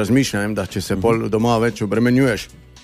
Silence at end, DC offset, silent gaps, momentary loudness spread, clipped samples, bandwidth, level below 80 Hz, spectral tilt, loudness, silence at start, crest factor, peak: 0.05 s; under 0.1%; none; 8 LU; under 0.1%; 15.5 kHz; -44 dBFS; -6 dB/octave; -18 LUFS; 0 s; 14 dB; -4 dBFS